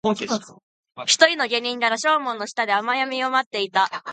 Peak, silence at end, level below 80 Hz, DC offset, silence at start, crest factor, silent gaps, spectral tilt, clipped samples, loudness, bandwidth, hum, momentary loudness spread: 0 dBFS; 0 s; -70 dBFS; under 0.1%; 0.05 s; 22 dB; 0.63-0.83 s, 3.46-3.51 s; -1.5 dB/octave; under 0.1%; -21 LUFS; 9.6 kHz; none; 10 LU